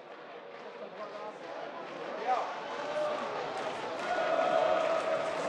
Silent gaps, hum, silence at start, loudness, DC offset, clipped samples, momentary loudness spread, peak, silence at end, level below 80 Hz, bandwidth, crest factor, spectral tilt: none; none; 0 s; -33 LUFS; under 0.1%; under 0.1%; 16 LU; -16 dBFS; 0 s; -82 dBFS; 10.5 kHz; 18 dB; -3.5 dB/octave